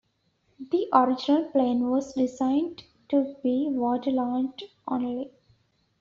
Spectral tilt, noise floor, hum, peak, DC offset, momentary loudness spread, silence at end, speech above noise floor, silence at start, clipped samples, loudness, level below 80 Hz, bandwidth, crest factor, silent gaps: -4.5 dB/octave; -70 dBFS; none; -6 dBFS; under 0.1%; 12 LU; 0.75 s; 45 dB; 0.6 s; under 0.1%; -26 LUFS; -68 dBFS; 7.4 kHz; 22 dB; none